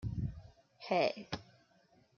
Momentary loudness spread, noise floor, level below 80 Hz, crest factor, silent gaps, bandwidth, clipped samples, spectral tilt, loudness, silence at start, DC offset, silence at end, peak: 18 LU; -69 dBFS; -56 dBFS; 22 dB; none; 7.2 kHz; under 0.1%; -6.5 dB/octave; -37 LUFS; 0 s; under 0.1%; 0.75 s; -18 dBFS